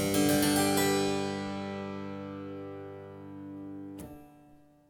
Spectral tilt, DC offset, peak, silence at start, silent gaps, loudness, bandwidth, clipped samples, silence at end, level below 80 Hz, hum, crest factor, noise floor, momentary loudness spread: -4 dB/octave; under 0.1%; -14 dBFS; 0 s; none; -30 LUFS; 19.5 kHz; under 0.1%; 0.35 s; -60 dBFS; none; 18 dB; -58 dBFS; 20 LU